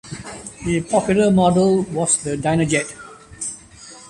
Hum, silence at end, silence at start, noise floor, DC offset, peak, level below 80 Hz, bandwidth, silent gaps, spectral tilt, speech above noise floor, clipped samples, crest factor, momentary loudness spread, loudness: none; 0 s; 0.05 s; -42 dBFS; under 0.1%; -4 dBFS; -46 dBFS; 11.5 kHz; none; -5 dB/octave; 24 dB; under 0.1%; 16 dB; 19 LU; -18 LUFS